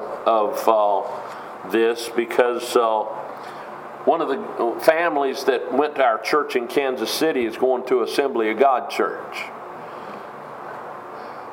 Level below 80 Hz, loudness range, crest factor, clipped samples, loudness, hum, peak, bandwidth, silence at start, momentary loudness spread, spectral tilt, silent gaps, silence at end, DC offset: -72 dBFS; 3 LU; 22 dB; under 0.1%; -21 LUFS; none; 0 dBFS; 16.5 kHz; 0 s; 16 LU; -3.5 dB/octave; none; 0 s; under 0.1%